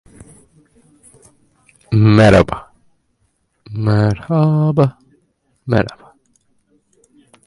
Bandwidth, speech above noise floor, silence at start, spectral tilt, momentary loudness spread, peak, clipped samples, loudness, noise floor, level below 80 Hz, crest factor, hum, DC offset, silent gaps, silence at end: 11 kHz; 52 dB; 1.9 s; -8 dB/octave; 16 LU; 0 dBFS; under 0.1%; -14 LUFS; -64 dBFS; -38 dBFS; 18 dB; none; under 0.1%; none; 1.55 s